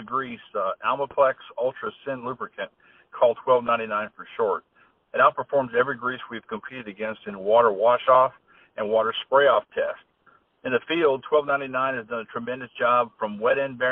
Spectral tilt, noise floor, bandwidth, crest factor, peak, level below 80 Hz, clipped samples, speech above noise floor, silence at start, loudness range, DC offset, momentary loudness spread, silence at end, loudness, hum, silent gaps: -8 dB/octave; -61 dBFS; 4 kHz; 20 dB; -6 dBFS; -68 dBFS; under 0.1%; 37 dB; 0 s; 5 LU; under 0.1%; 15 LU; 0 s; -24 LUFS; none; none